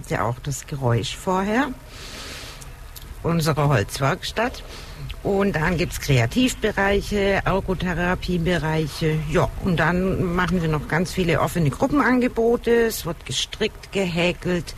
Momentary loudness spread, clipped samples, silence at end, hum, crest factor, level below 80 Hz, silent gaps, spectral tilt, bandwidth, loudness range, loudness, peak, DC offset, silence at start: 14 LU; under 0.1%; 0 s; none; 14 dB; -36 dBFS; none; -5.5 dB/octave; 14.5 kHz; 4 LU; -22 LUFS; -8 dBFS; under 0.1%; 0 s